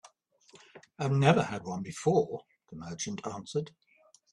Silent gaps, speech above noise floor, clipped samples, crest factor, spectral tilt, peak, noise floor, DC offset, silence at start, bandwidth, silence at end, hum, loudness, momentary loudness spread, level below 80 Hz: none; 31 dB; under 0.1%; 24 dB; -6 dB/octave; -8 dBFS; -62 dBFS; under 0.1%; 0.75 s; 11 kHz; 0.65 s; none; -31 LUFS; 19 LU; -68 dBFS